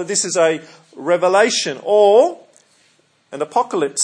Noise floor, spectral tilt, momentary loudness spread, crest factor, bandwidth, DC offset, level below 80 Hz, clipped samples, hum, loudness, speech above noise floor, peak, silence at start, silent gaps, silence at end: -58 dBFS; -2.5 dB/octave; 15 LU; 16 dB; 10.5 kHz; under 0.1%; -80 dBFS; under 0.1%; none; -16 LUFS; 42 dB; 0 dBFS; 0 s; none; 0 s